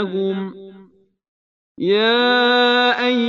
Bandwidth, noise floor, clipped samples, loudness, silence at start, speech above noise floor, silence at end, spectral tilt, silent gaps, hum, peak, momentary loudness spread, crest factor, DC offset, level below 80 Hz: 7.4 kHz; -50 dBFS; under 0.1%; -16 LUFS; 0 s; 34 dB; 0 s; -5.5 dB/octave; 1.28-1.75 s; none; -4 dBFS; 12 LU; 14 dB; under 0.1%; -72 dBFS